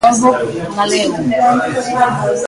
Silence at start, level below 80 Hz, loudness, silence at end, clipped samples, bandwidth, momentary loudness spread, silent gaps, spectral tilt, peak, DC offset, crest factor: 0 s; -48 dBFS; -14 LUFS; 0 s; under 0.1%; 11.5 kHz; 5 LU; none; -4 dB/octave; 0 dBFS; under 0.1%; 14 dB